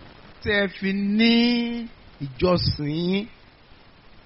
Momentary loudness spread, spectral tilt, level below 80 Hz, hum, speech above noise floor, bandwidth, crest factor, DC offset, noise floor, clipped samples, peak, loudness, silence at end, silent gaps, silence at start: 18 LU; -4 dB/octave; -46 dBFS; none; 28 dB; 5.8 kHz; 16 dB; under 0.1%; -50 dBFS; under 0.1%; -8 dBFS; -23 LUFS; 0.05 s; none; 0 s